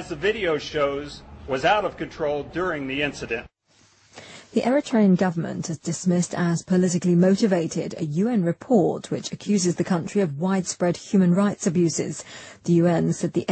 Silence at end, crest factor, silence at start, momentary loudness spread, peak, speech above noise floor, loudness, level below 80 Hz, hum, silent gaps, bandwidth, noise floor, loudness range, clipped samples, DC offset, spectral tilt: 0 s; 16 dB; 0 s; 11 LU; -6 dBFS; 37 dB; -23 LUFS; -54 dBFS; none; none; 8.8 kHz; -59 dBFS; 5 LU; under 0.1%; under 0.1%; -6 dB/octave